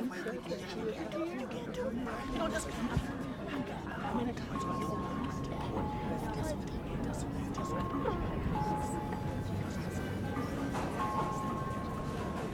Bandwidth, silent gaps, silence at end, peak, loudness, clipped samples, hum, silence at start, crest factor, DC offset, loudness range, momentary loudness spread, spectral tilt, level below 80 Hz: 18 kHz; none; 0 s; -18 dBFS; -37 LUFS; under 0.1%; none; 0 s; 18 dB; under 0.1%; 1 LU; 4 LU; -6.5 dB/octave; -48 dBFS